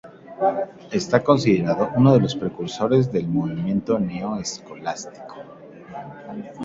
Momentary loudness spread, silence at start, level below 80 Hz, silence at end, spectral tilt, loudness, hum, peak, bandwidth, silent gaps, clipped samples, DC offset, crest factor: 20 LU; 0.05 s; -56 dBFS; 0 s; -6.5 dB/octave; -21 LUFS; none; -2 dBFS; 7.8 kHz; none; under 0.1%; under 0.1%; 20 dB